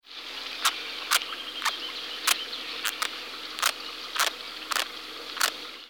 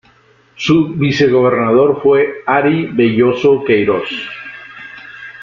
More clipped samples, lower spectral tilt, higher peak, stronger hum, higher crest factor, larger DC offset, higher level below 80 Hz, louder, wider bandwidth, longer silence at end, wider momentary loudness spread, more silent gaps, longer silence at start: neither; second, 2 dB/octave vs -7 dB/octave; second, -4 dBFS vs 0 dBFS; neither; first, 26 dB vs 12 dB; neither; second, -68 dBFS vs -50 dBFS; second, -29 LUFS vs -13 LUFS; first, over 20 kHz vs 7.2 kHz; about the same, 0 s vs 0 s; second, 10 LU vs 20 LU; neither; second, 0.05 s vs 0.6 s